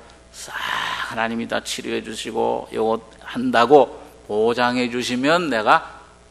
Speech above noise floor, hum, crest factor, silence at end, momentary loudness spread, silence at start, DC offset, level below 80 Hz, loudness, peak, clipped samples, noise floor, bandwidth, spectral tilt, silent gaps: 20 dB; none; 20 dB; 0.3 s; 12 LU; 0 s; under 0.1%; -54 dBFS; -20 LUFS; 0 dBFS; under 0.1%; -40 dBFS; 13 kHz; -4 dB/octave; none